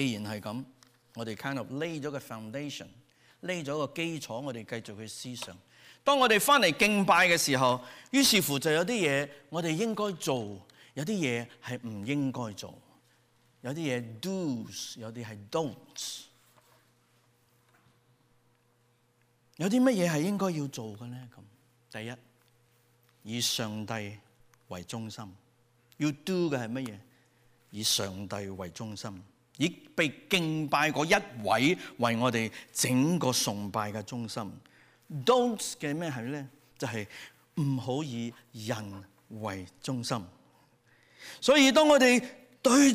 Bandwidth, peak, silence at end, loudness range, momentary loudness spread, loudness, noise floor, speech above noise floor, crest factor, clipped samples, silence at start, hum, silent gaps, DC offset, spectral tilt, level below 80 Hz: 15.5 kHz; -12 dBFS; 0 s; 12 LU; 20 LU; -29 LUFS; -69 dBFS; 39 dB; 18 dB; under 0.1%; 0 s; none; none; under 0.1%; -4 dB/octave; -70 dBFS